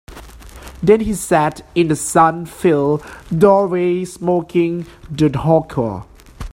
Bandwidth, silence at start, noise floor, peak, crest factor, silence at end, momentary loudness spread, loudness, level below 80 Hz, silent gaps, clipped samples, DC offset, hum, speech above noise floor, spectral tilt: 16.5 kHz; 0.1 s; -36 dBFS; 0 dBFS; 16 dB; 0 s; 11 LU; -16 LUFS; -40 dBFS; none; under 0.1%; under 0.1%; none; 21 dB; -6.5 dB/octave